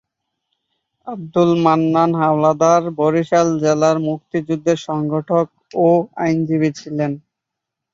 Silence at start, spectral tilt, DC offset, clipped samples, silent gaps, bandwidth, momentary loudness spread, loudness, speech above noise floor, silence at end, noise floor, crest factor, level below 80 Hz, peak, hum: 1.05 s; -7 dB/octave; under 0.1%; under 0.1%; none; 7.6 kHz; 9 LU; -17 LUFS; 65 dB; 0.75 s; -81 dBFS; 16 dB; -60 dBFS; -2 dBFS; none